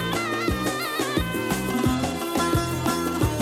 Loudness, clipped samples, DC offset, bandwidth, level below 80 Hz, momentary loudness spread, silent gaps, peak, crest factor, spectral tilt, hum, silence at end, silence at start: -25 LUFS; under 0.1%; under 0.1%; 16.5 kHz; -38 dBFS; 2 LU; none; -10 dBFS; 16 dB; -4.5 dB/octave; none; 0 s; 0 s